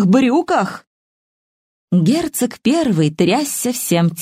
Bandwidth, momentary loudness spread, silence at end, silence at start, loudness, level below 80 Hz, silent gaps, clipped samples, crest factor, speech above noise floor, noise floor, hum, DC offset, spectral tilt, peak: 16 kHz; 5 LU; 0 s; 0 s; -16 LUFS; -56 dBFS; 0.87-1.88 s; under 0.1%; 16 dB; over 75 dB; under -90 dBFS; none; under 0.1%; -5.5 dB/octave; 0 dBFS